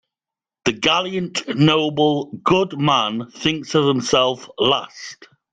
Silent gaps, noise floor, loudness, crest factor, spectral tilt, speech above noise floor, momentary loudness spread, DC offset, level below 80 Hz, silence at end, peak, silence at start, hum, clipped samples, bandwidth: none; -89 dBFS; -19 LUFS; 16 dB; -4.5 dB/octave; 70 dB; 8 LU; under 0.1%; -54 dBFS; 0.3 s; -2 dBFS; 0.65 s; none; under 0.1%; 9.4 kHz